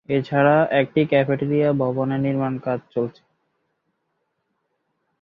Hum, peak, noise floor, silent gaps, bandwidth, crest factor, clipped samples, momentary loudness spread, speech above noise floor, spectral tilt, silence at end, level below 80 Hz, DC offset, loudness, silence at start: none; -4 dBFS; -74 dBFS; none; 5.6 kHz; 18 dB; under 0.1%; 10 LU; 54 dB; -10 dB/octave; 2.1 s; -62 dBFS; under 0.1%; -21 LUFS; 0.1 s